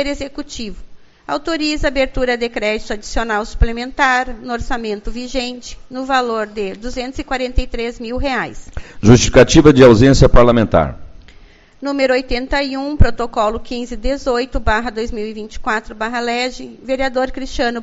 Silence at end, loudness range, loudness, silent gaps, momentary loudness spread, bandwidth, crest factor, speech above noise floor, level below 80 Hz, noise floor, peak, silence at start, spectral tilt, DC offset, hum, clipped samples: 0 s; 10 LU; -16 LUFS; none; 16 LU; 8 kHz; 16 dB; 28 dB; -24 dBFS; -43 dBFS; 0 dBFS; 0 s; -5.5 dB/octave; under 0.1%; none; 0.2%